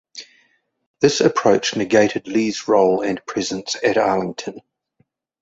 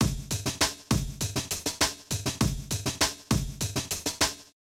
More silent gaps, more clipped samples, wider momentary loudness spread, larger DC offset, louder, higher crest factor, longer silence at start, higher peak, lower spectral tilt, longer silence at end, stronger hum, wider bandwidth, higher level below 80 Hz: first, 0.86-0.94 s vs none; neither; first, 12 LU vs 5 LU; neither; first, -18 LUFS vs -29 LUFS; about the same, 18 dB vs 20 dB; first, 0.15 s vs 0 s; first, -2 dBFS vs -10 dBFS; about the same, -4 dB/octave vs -3 dB/octave; first, 0.85 s vs 0.3 s; neither; second, 8 kHz vs 17 kHz; second, -58 dBFS vs -40 dBFS